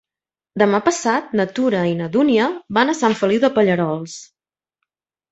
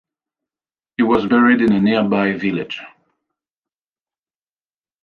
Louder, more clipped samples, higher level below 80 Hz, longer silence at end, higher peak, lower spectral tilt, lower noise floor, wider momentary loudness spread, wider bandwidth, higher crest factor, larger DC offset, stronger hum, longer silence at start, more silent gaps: about the same, -18 LUFS vs -16 LUFS; neither; second, -62 dBFS vs -54 dBFS; second, 1.1 s vs 2.15 s; about the same, -2 dBFS vs -2 dBFS; second, -5 dB/octave vs -8 dB/octave; about the same, under -90 dBFS vs under -90 dBFS; second, 8 LU vs 15 LU; first, 8.2 kHz vs 5.2 kHz; about the same, 16 dB vs 18 dB; neither; neither; second, 0.55 s vs 1 s; neither